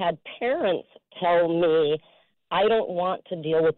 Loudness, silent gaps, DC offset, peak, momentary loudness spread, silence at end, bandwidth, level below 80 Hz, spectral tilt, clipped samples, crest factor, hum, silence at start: -24 LUFS; none; under 0.1%; -14 dBFS; 8 LU; 0.05 s; 4.2 kHz; -62 dBFS; -3.5 dB/octave; under 0.1%; 10 dB; none; 0 s